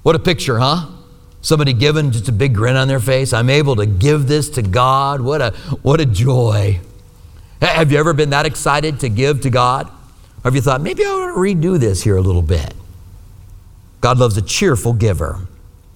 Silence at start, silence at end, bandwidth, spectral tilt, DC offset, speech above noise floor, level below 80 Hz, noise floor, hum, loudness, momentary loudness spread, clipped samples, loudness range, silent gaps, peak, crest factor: 0.05 s; 0.4 s; 17 kHz; -5.5 dB/octave; under 0.1%; 25 dB; -32 dBFS; -39 dBFS; none; -15 LUFS; 7 LU; under 0.1%; 3 LU; none; 0 dBFS; 14 dB